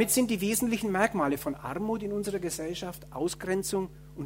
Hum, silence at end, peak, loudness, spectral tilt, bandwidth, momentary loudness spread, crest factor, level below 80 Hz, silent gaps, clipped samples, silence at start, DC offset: none; 0 s; -8 dBFS; -30 LUFS; -4 dB/octave; 16 kHz; 8 LU; 22 dB; -54 dBFS; none; under 0.1%; 0 s; under 0.1%